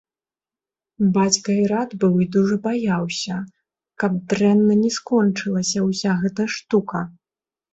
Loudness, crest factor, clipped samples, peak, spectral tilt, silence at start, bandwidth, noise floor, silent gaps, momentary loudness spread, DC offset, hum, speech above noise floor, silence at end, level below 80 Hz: -20 LUFS; 18 dB; under 0.1%; -4 dBFS; -5 dB/octave; 1 s; 8.2 kHz; under -90 dBFS; none; 9 LU; under 0.1%; none; over 71 dB; 0.65 s; -60 dBFS